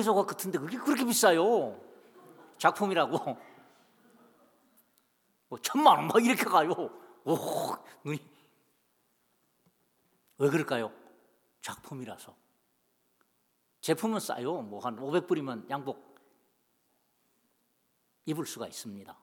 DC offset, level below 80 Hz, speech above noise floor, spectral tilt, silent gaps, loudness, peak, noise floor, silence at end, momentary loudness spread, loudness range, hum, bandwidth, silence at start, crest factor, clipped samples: under 0.1%; -86 dBFS; 45 dB; -4 dB/octave; none; -29 LUFS; -6 dBFS; -75 dBFS; 0.1 s; 19 LU; 12 LU; none; 19 kHz; 0 s; 26 dB; under 0.1%